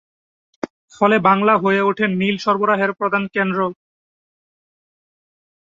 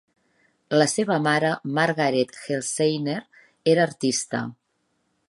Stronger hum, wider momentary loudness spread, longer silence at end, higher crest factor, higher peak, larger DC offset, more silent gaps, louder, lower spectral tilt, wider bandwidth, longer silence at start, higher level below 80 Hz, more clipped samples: neither; first, 16 LU vs 9 LU; first, 2.05 s vs 0.75 s; about the same, 18 dB vs 20 dB; about the same, -2 dBFS vs -4 dBFS; neither; first, 0.70-0.88 s vs none; first, -17 LUFS vs -23 LUFS; first, -6.5 dB/octave vs -4.5 dB/octave; second, 7.6 kHz vs 11.5 kHz; about the same, 0.65 s vs 0.7 s; first, -64 dBFS vs -72 dBFS; neither